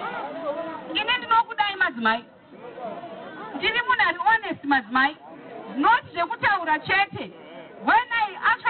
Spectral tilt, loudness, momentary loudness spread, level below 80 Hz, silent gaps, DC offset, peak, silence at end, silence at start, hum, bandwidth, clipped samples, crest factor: 0 dB/octave; -23 LUFS; 17 LU; -60 dBFS; none; under 0.1%; -10 dBFS; 0 s; 0 s; none; 4.6 kHz; under 0.1%; 14 dB